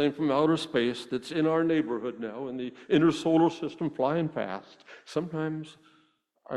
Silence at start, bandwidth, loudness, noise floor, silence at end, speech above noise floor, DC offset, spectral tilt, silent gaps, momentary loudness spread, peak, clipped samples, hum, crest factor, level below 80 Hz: 0 s; 11 kHz; -28 LUFS; -68 dBFS; 0 s; 40 dB; under 0.1%; -6.5 dB/octave; none; 12 LU; -10 dBFS; under 0.1%; none; 20 dB; -68 dBFS